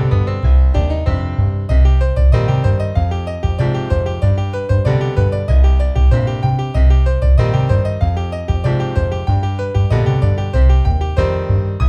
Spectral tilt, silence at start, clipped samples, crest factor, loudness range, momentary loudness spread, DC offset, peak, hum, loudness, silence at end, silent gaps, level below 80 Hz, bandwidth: -8.5 dB/octave; 0 s; under 0.1%; 12 dB; 2 LU; 5 LU; under 0.1%; 0 dBFS; none; -16 LUFS; 0 s; none; -16 dBFS; 7 kHz